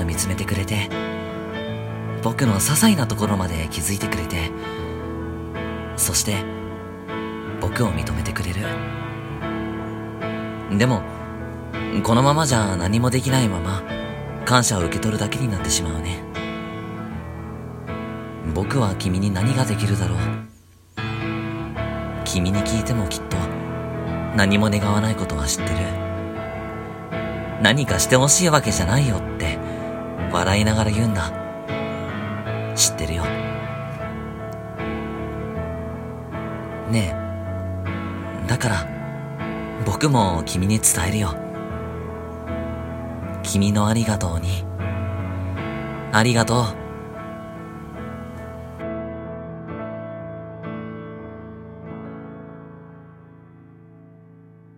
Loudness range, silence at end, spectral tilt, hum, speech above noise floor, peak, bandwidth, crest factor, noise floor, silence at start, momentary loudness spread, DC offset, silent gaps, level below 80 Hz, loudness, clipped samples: 11 LU; 0.1 s; -4.5 dB/octave; none; 27 dB; 0 dBFS; 16.5 kHz; 22 dB; -47 dBFS; 0 s; 15 LU; under 0.1%; none; -38 dBFS; -23 LUFS; under 0.1%